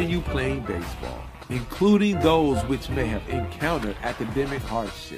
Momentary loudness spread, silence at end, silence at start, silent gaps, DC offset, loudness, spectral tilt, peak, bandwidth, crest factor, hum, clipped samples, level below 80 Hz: 12 LU; 0 s; 0 s; none; under 0.1%; -25 LUFS; -6.5 dB/octave; -6 dBFS; 15.5 kHz; 20 dB; none; under 0.1%; -38 dBFS